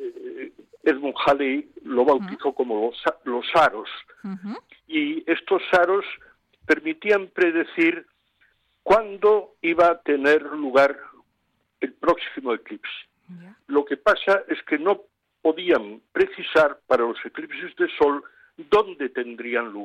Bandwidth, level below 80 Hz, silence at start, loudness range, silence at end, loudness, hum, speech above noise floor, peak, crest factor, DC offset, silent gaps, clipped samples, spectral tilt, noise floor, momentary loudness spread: 10.5 kHz; -60 dBFS; 0 s; 4 LU; 0 s; -22 LUFS; none; 49 dB; -6 dBFS; 16 dB; under 0.1%; none; under 0.1%; -5.5 dB/octave; -71 dBFS; 15 LU